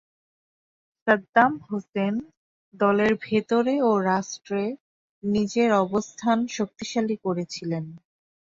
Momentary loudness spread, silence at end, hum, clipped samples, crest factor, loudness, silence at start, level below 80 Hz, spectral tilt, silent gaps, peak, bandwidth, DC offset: 11 LU; 0.6 s; none; under 0.1%; 20 dB; -24 LUFS; 1.05 s; -64 dBFS; -5.5 dB/octave; 1.29-1.33 s, 1.89-1.93 s, 2.37-2.72 s, 4.80-5.22 s; -6 dBFS; 7.8 kHz; under 0.1%